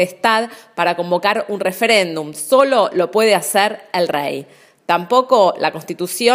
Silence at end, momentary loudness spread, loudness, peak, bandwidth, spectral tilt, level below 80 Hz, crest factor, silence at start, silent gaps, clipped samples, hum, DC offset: 0 s; 10 LU; -16 LUFS; 0 dBFS; 16 kHz; -3 dB/octave; -70 dBFS; 16 dB; 0 s; none; under 0.1%; none; under 0.1%